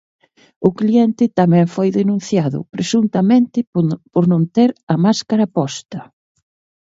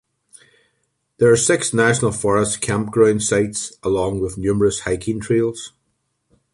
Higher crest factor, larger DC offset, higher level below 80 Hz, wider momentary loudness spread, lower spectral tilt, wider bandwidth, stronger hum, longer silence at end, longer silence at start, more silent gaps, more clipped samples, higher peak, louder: about the same, 16 dB vs 16 dB; neither; second, -60 dBFS vs -46 dBFS; about the same, 8 LU vs 8 LU; first, -7 dB/octave vs -4.5 dB/octave; second, 7.8 kHz vs 11.5 kHz; neither; about the same, 0.8 s vs 0.85 s; second, 0.6 s vs 1.2 s; first, 3.67-3.73 s, 4.83-4.87 s vs none; neither; about the same, 0 dBFS vs -2 dBFS; about the same, -16 LUFS vs -18 LUFS